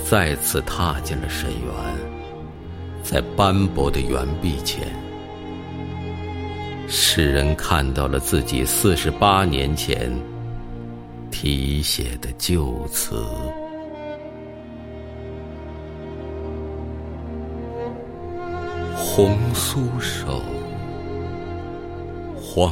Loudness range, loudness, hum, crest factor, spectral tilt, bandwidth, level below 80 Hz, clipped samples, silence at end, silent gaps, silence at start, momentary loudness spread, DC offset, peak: 12 LU; -23 LUFS; none; 22 dB; -4.5 dB/octave; 16.5 kHz; -32 dBFS; under 0.1%; 0 s; none; 0 s; 16 LU; under 0.1%; -2 dBFS